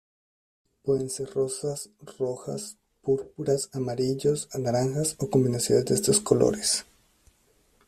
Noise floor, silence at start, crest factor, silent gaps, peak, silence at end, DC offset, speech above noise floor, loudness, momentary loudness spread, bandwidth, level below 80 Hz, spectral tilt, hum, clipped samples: -65 dBFS; 0.85 s; 22 dB; none; -6 dBFS; 1.05 s; under 0.1%; 39 dB; -26 LUFS; 13 LU; 14.5 kHz; -58 dBFS; -4.5 dB/octave; none; under 0.1%